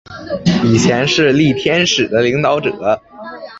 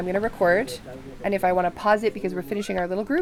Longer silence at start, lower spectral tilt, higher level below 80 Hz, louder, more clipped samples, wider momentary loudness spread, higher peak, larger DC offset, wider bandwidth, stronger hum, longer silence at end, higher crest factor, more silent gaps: about the same, 0.1 s vs 0 s; about the same, -5 dB/octave vs -6 dB/octave; about the same, -44 dBFS vs -48 dBFS; first, -13 LUFS vs -24 LUFS; neither; about the same, 9 LU vs 10 LU; first, 0 dBFS vs -8 dBFS; neither; second, 8 kHz vs 16.5 kHz; neither; about the same, 0 s vs 0 s; about the same, 14 dB vs 16 dB; neither